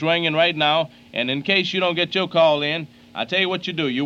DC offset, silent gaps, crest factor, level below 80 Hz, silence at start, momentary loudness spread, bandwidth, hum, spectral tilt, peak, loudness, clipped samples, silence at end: under 0.1%; none; 20 dB; -64 dBFS; 0 s; 9 LU; 7.8 kHz; none; -5.5 dB/octave; -2 dBFS; -20 LUFS; under 0.1%; 0 s